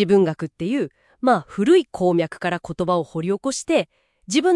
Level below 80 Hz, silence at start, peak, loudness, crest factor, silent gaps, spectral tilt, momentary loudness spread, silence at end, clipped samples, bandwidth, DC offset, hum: -58 dBFS; 0 s; -6 dBFS; -21 LUFS; 14 dB; none; -5.5 dB/octave; 9 LU; 0 s; under 0.1%; 11.5 kHz; under 0.1%; none